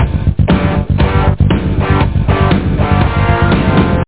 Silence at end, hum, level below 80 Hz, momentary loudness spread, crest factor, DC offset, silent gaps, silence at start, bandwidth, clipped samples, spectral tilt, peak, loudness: 0 s; none; -18 dBFS; 2 LU; 10 dB; 2%; none; 0 s; 4 kHz; under 0.1%; -11.5 dB/octave; 0 dBFS; -12 LUFS